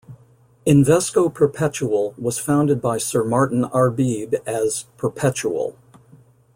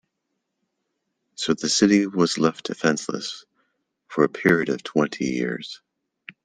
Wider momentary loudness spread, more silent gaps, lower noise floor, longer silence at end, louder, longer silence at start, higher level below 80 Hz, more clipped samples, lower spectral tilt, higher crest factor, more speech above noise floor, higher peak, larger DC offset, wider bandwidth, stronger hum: second, 8 LU vs 14 LU; neither; second, -53 dBFS vs -78 dBFS; first, 0.85 s vs 0.15 s; about the same, -20 LUFS vs -22 LUFS; second, 0.1 s vs 1.4 s; first, -54 dBFS vs -62 dBFS; neither; first, -6 dB/octave vs -4 dB/octave; second, 16 dB vs 22 dB; second, 34 dB vs 56 dB; about the same, -4 dBFS vs -2 dBFS; neither; first, 16.5 kHz vs 10 kHz; neither